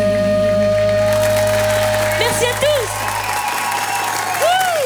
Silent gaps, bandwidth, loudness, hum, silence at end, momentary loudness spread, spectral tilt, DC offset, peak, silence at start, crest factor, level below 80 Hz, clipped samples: none; over 20 kHz; -16 LUFS; none; 0 s; 4 LU; -3.5 dB/octave; under 0.1%; -2 dBFS; 0 s; 14 dB; -38 dBFS; under 0.1%